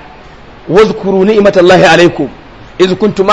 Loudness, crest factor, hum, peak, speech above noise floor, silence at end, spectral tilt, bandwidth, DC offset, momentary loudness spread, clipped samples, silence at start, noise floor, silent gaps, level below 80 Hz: -7 LUFS; 8 dB; none; 0 dBFS; 26 dB; 0 s; -5.5 dB/octave; 11 kHz; 0.8%; 8 LU; 3%; 0.65 s; -33 dBFS; none; -36 dBFS